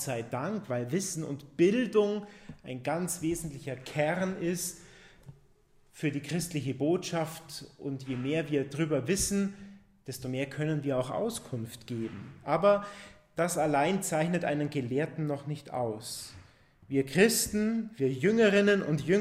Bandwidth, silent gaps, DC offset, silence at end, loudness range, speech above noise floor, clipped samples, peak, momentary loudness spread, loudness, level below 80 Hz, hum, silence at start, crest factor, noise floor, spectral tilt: 16 kHz; none; under 0.1%; 0 s; 5 LU; 33 dB; under 0.1%; -10 dBFS; 15 LU; -30 LUFS; -60 dBFS; none; 0 s; 20 dB; -63 dBFS; -5 dB/octave